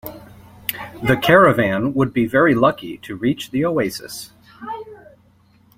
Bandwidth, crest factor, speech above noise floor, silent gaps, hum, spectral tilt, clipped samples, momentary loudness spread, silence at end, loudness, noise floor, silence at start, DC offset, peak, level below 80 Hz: 16.5 kHz; 18 dB; 37 dB; none; none; -6 dB/octave; under 0.1%; 20 LU; 0.8 s; -17 LUFS; -54 dBFS; 0.05 s; under 0.1%; 0 dBFS; -50 dBFS